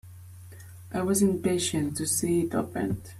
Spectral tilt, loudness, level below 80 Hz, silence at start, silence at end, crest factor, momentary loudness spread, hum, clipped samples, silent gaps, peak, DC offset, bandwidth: -4.5 dB/octave; -27 LUFS; -56 dBFS; 0.05 s; 0 s; 16 dB; 22 LU; none; under 0.1%; none; -12 dBFS; under 0.1%; 15.5 kHz